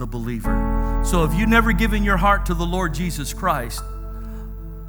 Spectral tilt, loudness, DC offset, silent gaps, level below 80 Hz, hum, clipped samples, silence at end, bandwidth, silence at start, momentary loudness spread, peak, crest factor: -5.5 dB/octave; -21 LUFS; under 0.1%; none; -24 dBFS; none; under 0.1%; 0 s; over 20 kHz; 0 s; 17 LU; -2 dBFS; 18 dB